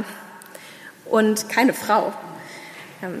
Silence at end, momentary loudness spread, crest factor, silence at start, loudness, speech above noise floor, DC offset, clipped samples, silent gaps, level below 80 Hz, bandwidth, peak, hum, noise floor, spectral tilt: 0 s; 21 LU; 20 dB; 0 s; -20 LUFS; 23 dB; under 0.1%; under 0.1%; none; -74 dBFS; 15.5 kHz; -4 dBFS; none; -43 dBFS; -4 dB/octave